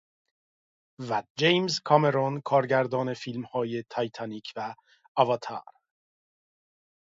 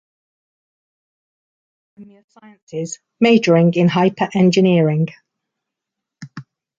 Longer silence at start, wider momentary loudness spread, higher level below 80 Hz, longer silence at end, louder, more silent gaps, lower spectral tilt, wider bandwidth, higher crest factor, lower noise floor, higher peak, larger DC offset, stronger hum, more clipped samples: second, 1 s vs 2 s; second, 14 LU vs 19 LU; second, -74 dBFS vs -64 dBFS; first, 1.5 s vs 0.4 s; second, -27 LUFS vs -15 LUFS; about the same, 1.30-1.35 s, 5.08-5.15 s vs 2.24-2.28 s, 2.62-2.67 s; about the same, -5.5 dB/octave vs -6.5 dB/octave; about the same, 7.8 kHz vs 7.8 kHz; first, 24 dB vs 16 dB; first, under -90 dBFS vs -83 dBFS; about the same, -4 dBFS vs -2 dBFS; neither; neither; neither